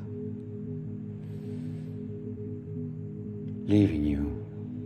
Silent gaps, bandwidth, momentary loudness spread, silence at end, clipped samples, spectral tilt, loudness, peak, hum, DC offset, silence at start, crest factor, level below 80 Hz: none; 9.2 kHz; 14 LU; 0 s; under 0.1%; -9.5 dB/octave; -33 LUFS; -12 dBFS; none; under 0.1%; 0 s; 20 dB; -46 dBFS